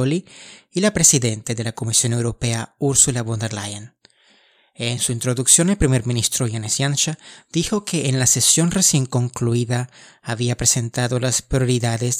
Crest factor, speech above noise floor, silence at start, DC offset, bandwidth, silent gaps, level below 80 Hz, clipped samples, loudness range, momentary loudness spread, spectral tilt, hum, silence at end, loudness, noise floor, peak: 20 dB; 37 dB; 0 s; under 0.1%; 16 kHz; none; -42 dBFS; under 0.1%; 3 LU; 12 LU; -3.5 dB/octave; none; 0 s; -18 LUFS; -56 dBFS; 0 dBFS